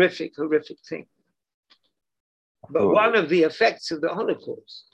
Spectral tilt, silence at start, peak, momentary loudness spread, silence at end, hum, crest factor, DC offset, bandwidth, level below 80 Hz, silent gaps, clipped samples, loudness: -5.5 dB/octave; 0 s; -6 dBFS; 18 LU; 0.15 s; none; 20 dB; under 0.1%; 8.8 kHz; -68 dBFS; 1.54-1.63 s, 2.20-2.55 s; under 0.1%; -22 LUFS